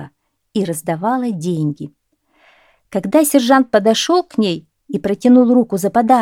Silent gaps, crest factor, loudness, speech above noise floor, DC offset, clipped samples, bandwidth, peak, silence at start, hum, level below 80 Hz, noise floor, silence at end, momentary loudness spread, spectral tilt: none; 16 dB; -15 LUFS; 42 dB; under 0.1%; under 0.1%; 17.5 kHz; 0 dBFS; 0 s; none; -58 dBFS; -56 dBFS; 0 s; 13 LU; -5 dB/octave